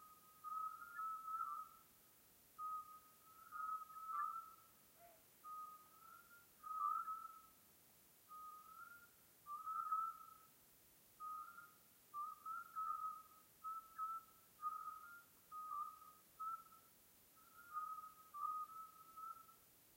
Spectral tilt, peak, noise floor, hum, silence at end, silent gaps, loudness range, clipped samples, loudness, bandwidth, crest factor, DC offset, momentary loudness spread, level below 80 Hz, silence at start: -1.5 dB/octave; -34 dBFS; -70 dBFS; none; 0 s; none; 3 LU; under 0.1%; -50 LUFS; 16 kHz; 20 dB; under 0.1%; 20 LU; under -90 dBFS; 0 s